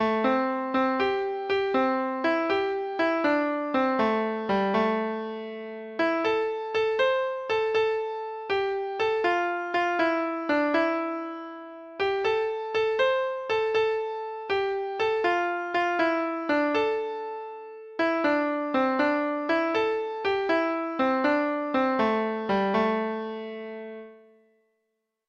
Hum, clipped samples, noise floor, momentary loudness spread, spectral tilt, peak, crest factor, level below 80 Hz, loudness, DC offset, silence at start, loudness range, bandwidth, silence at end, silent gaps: none; under 0.1%; -79 dBFS; 10 LU; -6 dB/octave; -12 dBFS; 16 dB; -64 dBFS; -26 LUFS; under 0.1%; 0 s; 2 LU; 7.6 kHz; 1.1 s; none